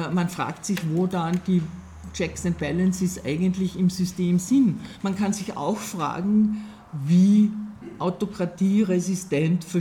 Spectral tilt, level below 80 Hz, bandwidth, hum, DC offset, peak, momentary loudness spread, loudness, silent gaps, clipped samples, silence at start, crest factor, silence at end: -6.5 dB/octave; -52 dBFS; 15 kHz; none; under 0.1%; -10 dBFS; 10 LU; -24 LUFS; none; under 0.1%; 0 s; 14 dB; 0 s